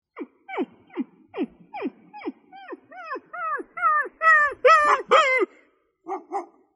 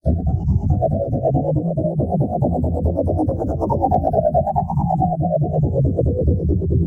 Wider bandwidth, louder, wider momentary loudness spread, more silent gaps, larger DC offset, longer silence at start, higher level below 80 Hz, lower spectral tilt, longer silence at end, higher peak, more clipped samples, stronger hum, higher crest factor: first, 11.5 kHz vs 1.7 kHz; about the same, -21 LUFS vs -19 LUFS; first, 21 LU vs 3 LU; neither; neither; about the same, 0.15 s vs 0.05 s; second, -68 dBFS vs -28 dBFS; second, -2.5 dB/octave vs -13 dB/octave; first, 0.3 s vs 0 s; about the same, -4 dBFS vs -4 dBFS; neither; neither; first, 20 dB vs 14 dB